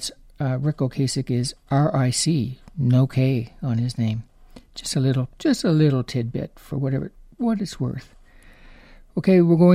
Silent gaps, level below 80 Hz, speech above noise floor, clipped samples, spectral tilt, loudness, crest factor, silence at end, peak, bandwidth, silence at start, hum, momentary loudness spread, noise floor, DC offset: none; -48 dBFS; 27 dB; under 0.1%; -6.5 dB/octave; -23 LUFS; 18 dB; 0 s; -4 dBFS; 15 kHz; 0 s; none; 12 LU; -48 dBFS; under 0.1%